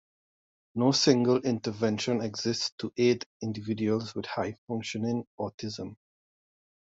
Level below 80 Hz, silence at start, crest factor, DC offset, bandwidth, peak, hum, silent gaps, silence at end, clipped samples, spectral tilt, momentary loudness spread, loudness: -70 dBFS; 0.75 s; 22 dB; under 0.1%; 8 kHz; -8 dBFS; none; 2.72-2.78 s, 3.26-3.40 s, 4.58-4.67 s, 5.27-5.38 s, 5.54-5.58 s; 0.95 s; under 0.1%; -5 dB/octave; 14 LU; -29 LUFS